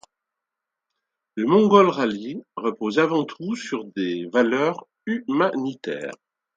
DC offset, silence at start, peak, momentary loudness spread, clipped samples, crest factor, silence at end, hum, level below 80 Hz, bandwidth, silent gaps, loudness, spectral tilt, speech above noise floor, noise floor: under 0.1%; 1.35 s; 0 dBFS; 16 LU; under 0.1%; 22 dB; 0.4 s; none; -72 dBFS; 7.8 kHz; none; -22 LUFS; -6 dB/octave; 63 dB; -85 dBFS